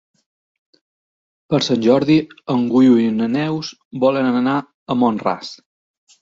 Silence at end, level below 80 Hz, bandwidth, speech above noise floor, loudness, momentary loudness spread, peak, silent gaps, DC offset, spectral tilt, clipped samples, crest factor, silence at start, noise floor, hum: 0.65 s; -58 dBFS; 7.6 kHz; over 74 dB; -17 LUFS; 10 LU; -2 dBFS; 3.85-3.91 s, 4.74-4.86 s; under 0.1%; -6.5 dB/octave; under 0.1%; 16 dB; 1.5 s; under -90 dBFS; none